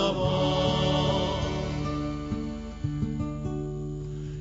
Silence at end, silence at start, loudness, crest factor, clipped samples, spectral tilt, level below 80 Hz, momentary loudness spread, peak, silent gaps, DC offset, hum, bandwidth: 0 s; 0 s; -29 LUFS; 14 dB; under 0.1%; -6.5 dB/octave; -40 dBFS; 10 LU; -14 dBFS; none; under 0.1%; none; 8 kHz